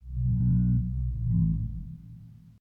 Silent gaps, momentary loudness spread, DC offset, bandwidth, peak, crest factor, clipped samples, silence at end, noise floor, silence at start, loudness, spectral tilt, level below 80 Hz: none; 19 LU; under 0.1%; 1.5 kHz; -16 dBFS; 12 dB; under 0.1%; 0.1 s; -48 dBFS; 0.05 s; -28 LUFS; -13 dB/octave; -34 dBFS